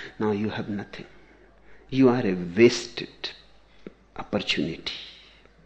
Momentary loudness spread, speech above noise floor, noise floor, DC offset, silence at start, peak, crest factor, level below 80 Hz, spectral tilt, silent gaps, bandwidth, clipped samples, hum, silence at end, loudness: 21 LU; 28 dB; -53 dBFS; under 0.1%; 0 s; -4 dBFS; 22 dB; -56 dBFS; -5.5 dB/octave; none; 8.6 kHz; under 0.1%; none; 0.55 s; -25 LUFS